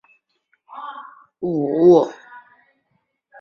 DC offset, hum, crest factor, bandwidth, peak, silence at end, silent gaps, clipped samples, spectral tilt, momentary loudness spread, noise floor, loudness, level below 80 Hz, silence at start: under 0.1%; none; 20 dB; 7 kHz; -2 dBFS; 1 s; none; under 0.1%; -8.5 dB/octave; 26 LU; -70 dBFS; -17 LUFS; -66 dBFS; 0.7 s